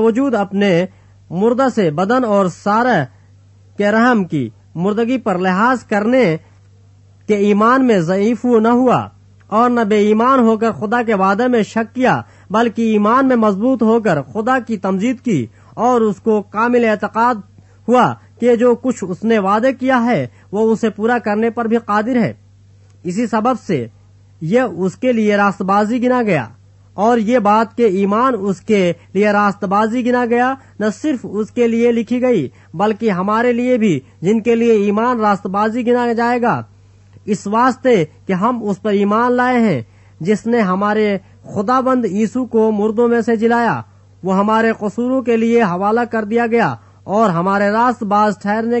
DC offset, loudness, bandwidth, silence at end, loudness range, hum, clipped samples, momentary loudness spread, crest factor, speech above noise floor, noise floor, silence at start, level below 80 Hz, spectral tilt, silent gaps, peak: under 0.1%; -15 LUFS; 8.4 kHz; 0 s; 2 LU; none; under 0.1%; 7 LU; 14 dB; 31 dB; -46 dBFS; 0 s; -58 dBFS; -7 dB/octave; none; -2 dBFS